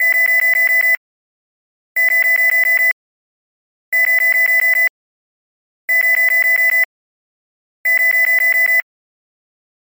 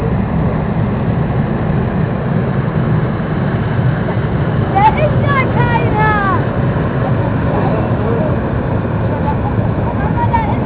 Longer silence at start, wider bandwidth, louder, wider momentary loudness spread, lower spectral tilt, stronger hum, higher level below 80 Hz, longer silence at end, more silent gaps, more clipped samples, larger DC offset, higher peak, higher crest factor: about the same, 0 s vs 0 s; first, 17 kHz vs 4 kHz; first, -12 LUFS vs -15 LUFS; first, 7 LU vs 4 LU; second, 2.5 dB/octave vs -12 dB/octave; neither; second, -86 dBFS vs -26 dBFS; first, 1 s vs 0 s; first, 0.97-1.95 s, 2.92-3.92 s, 4.89-5.88 s, 6.85-7.84 s vs none; neither; second, under 0.1% vs 0.3%; second, -6 dBFS vs -2 dBFS; about the same, 10 dB vs 12 dB